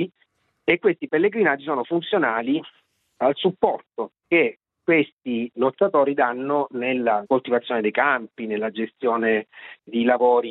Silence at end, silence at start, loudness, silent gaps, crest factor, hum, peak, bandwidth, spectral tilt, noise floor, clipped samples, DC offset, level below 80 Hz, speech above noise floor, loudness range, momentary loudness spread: 0 s; 0 s; -22 LUFS; 5.12-5.17 s; 22 dB; none; 0 dBFS; 4.1 kHz; -9 dB/octave; -67 dBFS; under 0.1%; under 0.1%; -68 dBFS; 45 dB; 2 LU; 9 LU